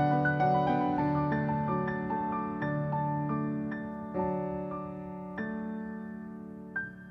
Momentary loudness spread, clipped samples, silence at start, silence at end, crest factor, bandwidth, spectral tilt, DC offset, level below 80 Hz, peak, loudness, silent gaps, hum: 13 LU; under 0.1%; 0 s; 0 s; 16 dB; 5.8 kHz; -10 dB/octave; under 0.1%; -58 dBFS; -16 dBFS; -32 LUFS; none; none